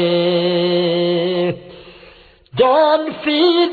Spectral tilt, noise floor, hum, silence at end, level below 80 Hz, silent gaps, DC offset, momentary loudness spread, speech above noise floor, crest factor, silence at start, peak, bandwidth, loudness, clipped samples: -8.5 dB/octave; -45 dBFS; none; 0 s; -54 dBFS; none; under 0.1%; 8 LU; 31 dB; 14 dB; 0 s; -2 dBFS; 4.8 kHz; -16 LUFS; under 0.1%